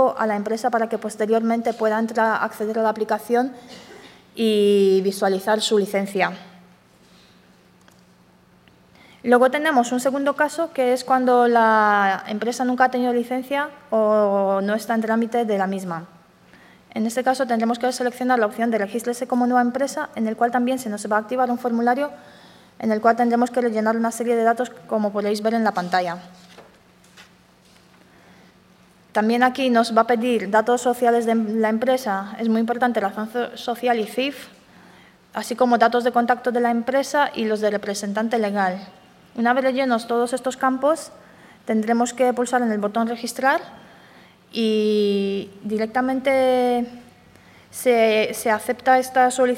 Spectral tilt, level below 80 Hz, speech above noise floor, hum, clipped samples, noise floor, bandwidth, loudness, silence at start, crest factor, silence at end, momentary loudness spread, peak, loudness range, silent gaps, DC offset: -4.5 dB/octave; -68 dBFS; 34 dB; none; under 0.1%; -54 dBFS; 16.5 kHz; -21 LUFS; 0 s; 20 dB; 0 s; 9 LU; -2 dBFS; 5 LU; none; under 0.1%